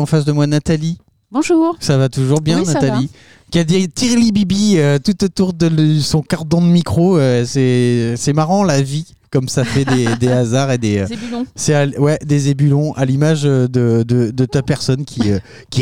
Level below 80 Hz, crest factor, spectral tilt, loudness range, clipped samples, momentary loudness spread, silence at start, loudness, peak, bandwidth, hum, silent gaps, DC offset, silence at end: -42 dBFS; 12 dB; -6 dB/octave; 2 LU; under 0.1%; 7 LU; 0 s; -15 LUFS; -2 dBFS; 14.5 kHz; none; none; 0.9%; 0 s